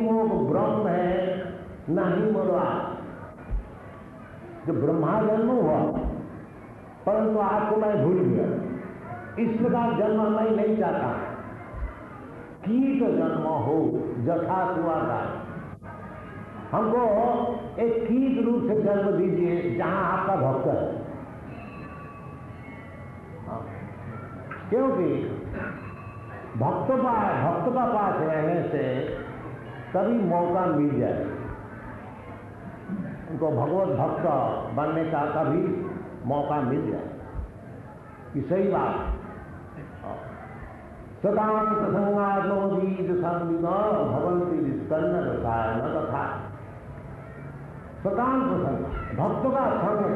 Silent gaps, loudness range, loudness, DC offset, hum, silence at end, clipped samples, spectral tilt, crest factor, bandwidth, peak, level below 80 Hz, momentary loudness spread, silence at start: none; 6 LU; -26 LUFS; under 0.1%; none; 0 s; under 0.1%; -10 dB/octave; 14 dB; 4.9 kHz; -12 dBFS; -46 dBFS; 17 LU; 0 s